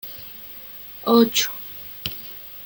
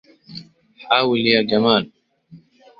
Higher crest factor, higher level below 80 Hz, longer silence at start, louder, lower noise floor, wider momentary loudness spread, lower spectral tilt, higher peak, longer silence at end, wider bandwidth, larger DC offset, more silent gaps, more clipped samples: about the same, 20 dB vs 20 dB; about the same, -58 dBFS vs -60 dBFS; second, 0.05 s vs 0.3 s; second, -21 LUFS vs -17 LUFS; second, -39 dBFS vs -48 dBFS; second, 19 LU vs 22 LU; second, -3 dB/octave vs -7 dB/octave; about the same, -4 dBFS vs -2 dBFS; second, 0 s vs 0.45 s; first, 17 kHz vs 5.8 kHz; neither; neither; neither